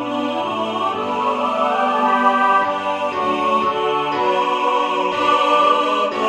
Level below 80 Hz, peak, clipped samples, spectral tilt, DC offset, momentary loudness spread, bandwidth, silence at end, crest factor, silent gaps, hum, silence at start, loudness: -62 dBFS; -4 dBFS; under 0.1%; -4 dB/octave; under 0.1%; 7 LU; 12 kHz; 0 s; 14 dB; none; none; 0 s; -18 LUFS